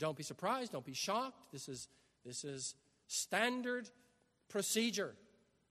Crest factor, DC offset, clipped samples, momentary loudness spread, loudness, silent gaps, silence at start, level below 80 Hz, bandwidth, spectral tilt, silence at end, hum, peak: 22 dB; under 0.1%; under 0.1%; 15 LU; -40 LUFS; none; 0 s; -82 dBFS; 13.5 kHz; -2.5 dB/octave; 0.55 s; none; -20 dBFS